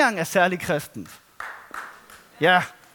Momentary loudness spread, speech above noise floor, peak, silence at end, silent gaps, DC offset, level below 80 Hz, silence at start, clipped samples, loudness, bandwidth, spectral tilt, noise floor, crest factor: 20 LU; 26 dB; -4 dBFS; 0.2 s; none; under 0.1%; -62 dBFS; 0 s; under 0.1%; -21 LUFS; 19 kHz; -4 dB/octave; -48 dBFS; 20 dB